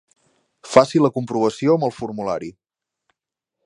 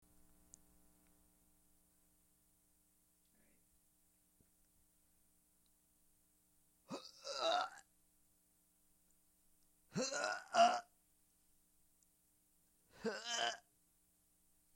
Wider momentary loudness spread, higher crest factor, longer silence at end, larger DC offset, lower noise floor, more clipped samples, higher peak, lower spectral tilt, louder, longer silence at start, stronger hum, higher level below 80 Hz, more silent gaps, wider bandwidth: second, 12 LU vs 19 LU; second, 22 dB vs 28 dB; about the same, 1.15 s vs 1.15 s; neither; first, -84 dBFS vs -77 dBFS; neither; first, 0 dBFS vs -20 dBFS; first, -6 dB/octave vs -2 dB/octave; first, -19 LUFS vs -39 LUFS; second, 0.65 s vs 6.9 s; neither; first, -60 dBFS vs -82 dBFS; neither; second, 11.5 kHz vs 16.5 kHz